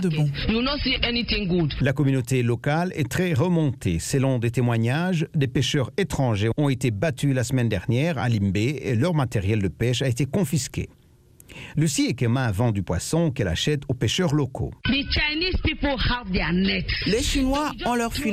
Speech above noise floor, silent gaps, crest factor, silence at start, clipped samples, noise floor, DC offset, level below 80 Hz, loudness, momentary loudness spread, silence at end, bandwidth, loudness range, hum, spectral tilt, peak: 30 dB; none; 16 dB; 0 s; under 0.1%; -53 dBFS; under 0.1%; -36 dBFS; -23 LUFS; 3 LU; 0 s; 15.5 kHz; 2 LU; none; -5.5 dB/octave; -6 dBFS